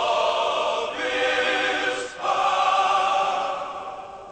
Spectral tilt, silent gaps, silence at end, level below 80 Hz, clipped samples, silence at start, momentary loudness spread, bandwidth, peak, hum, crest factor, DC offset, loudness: -1.5 dB/octave; none; 0 s; -60 dBFS; under 0.1%; 0 s; 11 LU; 8.8 kHz; -10 dBFS; none; 14 dB; under 0.1%; -23 LUFS